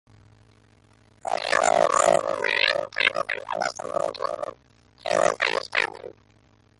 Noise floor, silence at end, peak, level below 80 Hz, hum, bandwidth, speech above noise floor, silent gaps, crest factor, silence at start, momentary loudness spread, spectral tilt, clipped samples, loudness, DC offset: -59 dBFS; 0.7 s; -4 dBFS; -64 dBFS; none; 11.5 kHz; 34 dB; none; 22 dB; 1.25 s; 14 LU; -1.5 dB/octave; under 0.1%; -23 LUFS; under 0.1%